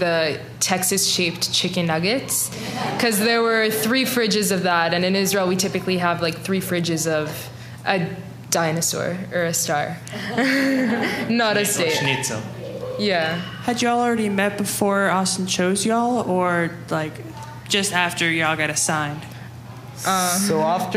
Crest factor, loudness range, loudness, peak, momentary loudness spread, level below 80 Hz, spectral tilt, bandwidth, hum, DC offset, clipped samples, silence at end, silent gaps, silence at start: 20 dB; 3 LU; -20 LUFS; -2 dBFS; 10 LU; -58 dBFS; -3.5 dB/octave; 15.5 kHz; none; under 0.1%; under 0.1%; 0 s; none; 0 s